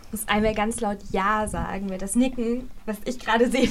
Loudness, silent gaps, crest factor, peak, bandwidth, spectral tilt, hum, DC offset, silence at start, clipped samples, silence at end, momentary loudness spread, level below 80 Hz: -25 LUFS; none; 18 dB; -6 dBFS; 15.5 kHz; -4.5 dB/octave; none; under 0.1%; 0 s; under 0.1%; 0 s; 9 LU; -40 dBFS